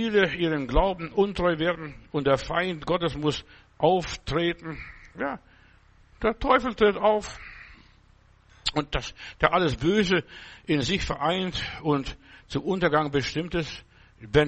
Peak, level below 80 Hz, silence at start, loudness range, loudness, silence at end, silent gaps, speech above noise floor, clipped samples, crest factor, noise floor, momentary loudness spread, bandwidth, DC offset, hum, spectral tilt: -2 dBFS; -42 dBFS; 0 s; 2 LU; -26 LUFS; 0 s; none; 32 dB; under 0.1%; 24 dB; -58 dBFS; 15 LU; 8.4 kHz; under 0.1%; none; -5.5 dB/octave